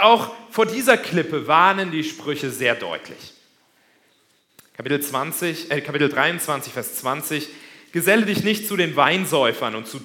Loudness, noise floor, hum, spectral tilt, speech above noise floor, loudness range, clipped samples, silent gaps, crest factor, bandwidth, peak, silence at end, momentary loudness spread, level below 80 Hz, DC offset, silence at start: -20 LUFS; -62 dBFS; none; -3.5 dB/octave; 41 dB; 7 LU; under 0.1%; none; 22 dB; 18 kHz; 0 dBFS; 0 s; 11 LU; -68 dBFS; under 0.1%; 0 s